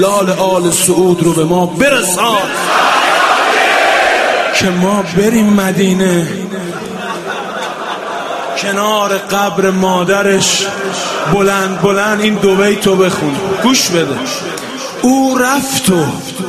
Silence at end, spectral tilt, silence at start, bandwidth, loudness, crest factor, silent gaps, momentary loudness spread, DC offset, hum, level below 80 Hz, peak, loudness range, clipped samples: 0 s; -4 dB/octave; 0 s; 14 kHz; -12 LUFS; 12 dB; none; 10 LU; under 0.1%; none; -46 dBFS; 0 dBFS; 5 LU; under 0.1%